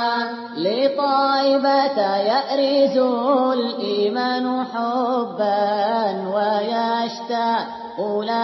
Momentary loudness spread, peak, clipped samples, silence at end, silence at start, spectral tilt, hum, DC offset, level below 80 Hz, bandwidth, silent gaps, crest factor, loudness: 7 LU; -6 dBFS; under 0.1%; 0 s; 0 s; -5.5 dB/octave; none; under 0.1%; -76 dBFS; 6 kHz; none; 14 dB; -20 LUFS